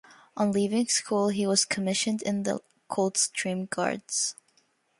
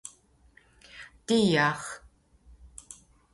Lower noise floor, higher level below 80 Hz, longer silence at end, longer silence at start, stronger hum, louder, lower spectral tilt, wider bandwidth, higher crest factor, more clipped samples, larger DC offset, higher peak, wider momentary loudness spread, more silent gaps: first, -68 dBFS vs -61 dBFS; second, -72 dBFS vs -60 dBFS; first, 0.65 s vs 0.4 s; first, 0.35 s vs 0.05 s; neither; about the same, -27 LUFS vs -25 LUFS; second, -3 dB/octave vs -4.5 dB/octave; about the same, 11.5 kHz vs 11.5 kHz; about the same, 20 dB vs 20 dB; neither; neither; about the same, -10 dBFS vs -12 dBFS; second, 7 LU vs 26 LU; neither